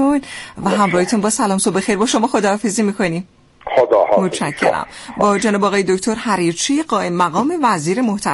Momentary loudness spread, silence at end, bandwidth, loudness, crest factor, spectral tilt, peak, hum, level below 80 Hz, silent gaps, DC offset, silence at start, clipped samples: 6 LU; 0 s; 11.5 kHz; -16 LUFS; 14 dB; -4.5 dB/octave; -2 dBFS; none; -52 dBFS; none; under 0.1%; 0 s; under 0.1%